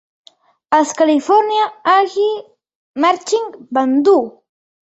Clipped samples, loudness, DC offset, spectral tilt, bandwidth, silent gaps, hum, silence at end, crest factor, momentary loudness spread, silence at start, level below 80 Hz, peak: under 0.1%; -15 LUFS; under 0.1%; -2.5 dB/octave; 8.2 kHz; 2.75-2.94 s; none; 0.6 s; 16 dB; 8 LU; 0.7 s; -66 dBFS; 0 dBFS